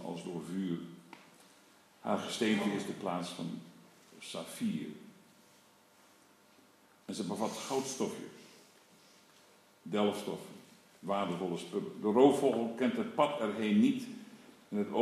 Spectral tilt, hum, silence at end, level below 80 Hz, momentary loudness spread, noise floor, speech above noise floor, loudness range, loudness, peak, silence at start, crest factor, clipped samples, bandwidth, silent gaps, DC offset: -5.5 dB/octave; none; 0 s; -86 dBFS; 21 LU; -64 dBFS; 31 dB; 12 LU; -34 LUFS; -12 dBFS; 0 s; 22 dB; under 0.1%; 14.5 kHz; none; under 0.1%